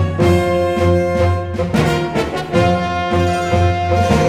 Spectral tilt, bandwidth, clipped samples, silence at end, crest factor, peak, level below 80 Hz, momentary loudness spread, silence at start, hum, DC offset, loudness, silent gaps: -6.5 dB/octave; 14 kHz; under 0.1%; 0 s; 14 dB; 0 dBFS; -32 dBFS; 4 LU; 0 s; none; under 0.1%; -16 LUFS; none